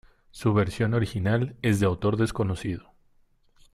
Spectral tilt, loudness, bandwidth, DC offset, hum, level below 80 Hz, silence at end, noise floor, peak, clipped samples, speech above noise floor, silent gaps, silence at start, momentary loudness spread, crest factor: -7 dB/octave; -26 LUFS; 13.5 kHz; under 0.1%; none; -50 dBFS; 0.95 s; -62 dBFS; -10 dBFS; under 0.1%; 37 dB; none; 0.35 s; 7 LU; 16 dB